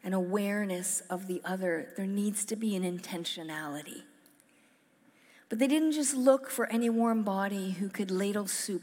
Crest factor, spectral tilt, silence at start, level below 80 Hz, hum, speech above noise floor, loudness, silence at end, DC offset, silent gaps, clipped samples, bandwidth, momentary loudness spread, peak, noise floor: 20 dB; -4.5 dB/octave; 0.05 s; under -90 dBFS; none; 35 dB; -31 LUFS; 0 s; under 0.1%; none; under 0.1%; 17 kHz; 10 LU; -10 dBFS; -65 dBFS